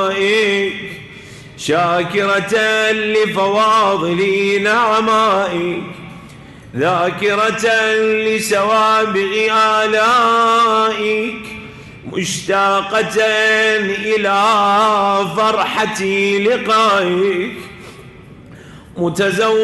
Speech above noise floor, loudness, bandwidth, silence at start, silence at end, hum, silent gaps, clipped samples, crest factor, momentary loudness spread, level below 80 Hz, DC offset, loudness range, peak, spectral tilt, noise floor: 23 dB; -14 LUFS; 12 kHz; 0 s; 0 s; none; none; under 0.1%; 10 dB; 14 LU; -52 dBFS; under 0.1%; 3 LU; -6 dBFS; -3.5 dB/octave; -38 dBFS